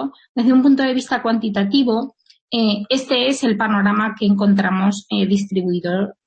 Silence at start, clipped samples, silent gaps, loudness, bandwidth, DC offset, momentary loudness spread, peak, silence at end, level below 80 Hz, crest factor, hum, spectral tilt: 0 s; under 0.1%; 0.29-0.35 s, 2.41-2.48 s; -18 LUFS; 8.8 kHz; under 0.1%; 6 LU; -4 dBFS; 0.15 s; -60 dBFS; 12 dB; none; -5.5 dB/octave